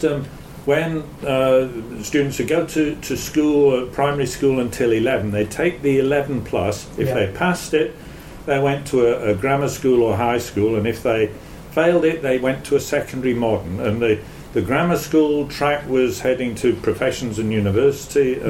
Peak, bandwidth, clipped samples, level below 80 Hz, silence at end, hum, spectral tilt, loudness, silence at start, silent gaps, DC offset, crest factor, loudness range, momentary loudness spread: -4 dBFS; 16.5 kHz; under 0.1%; -44 dBFS; 0 s; none; -6 dB/octave; -20 LUFS; 0 s; none; under 0.1%; 14 dB; 2 LU; 7 LU